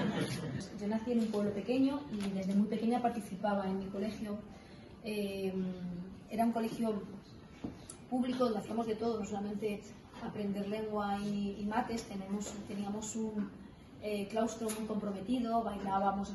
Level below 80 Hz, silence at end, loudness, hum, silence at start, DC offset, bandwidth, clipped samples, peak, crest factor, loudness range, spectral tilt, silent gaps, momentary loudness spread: -62 dBFS; 0 s; -37 LUFS; none; 0 s; under 0.1%; 12.5 kHz; under 0.1%; -20 dBFS; 16 dB; 4 LU; -6 dB/octave; none; 13 LU